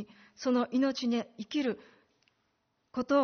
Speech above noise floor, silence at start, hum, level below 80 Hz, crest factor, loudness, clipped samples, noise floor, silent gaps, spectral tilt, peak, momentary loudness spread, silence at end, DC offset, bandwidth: 47 dB; 0 s; none; -74 dBFS; 16 dB; -32 LUFS; under 0.1%; -77 dBFS; none; -3.5 dB/octave; -16 dBFS; 12 LU; 0 s; under 0.1%; 6.6 kHz